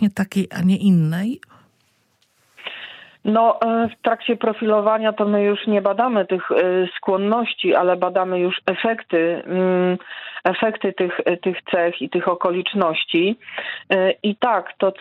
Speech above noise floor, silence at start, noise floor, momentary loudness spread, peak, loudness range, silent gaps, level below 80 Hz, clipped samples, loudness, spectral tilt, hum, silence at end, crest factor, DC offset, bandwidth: 44 dB; 0 s; -63 dBFS; 8 LU; -2 dBFS; 3 LU; none; -68 dBFS; under 0.1%; -20 LUFS; -7 dB/octave; none; 0.1 s; 18 dB; under 0.1%; 12.5 kHz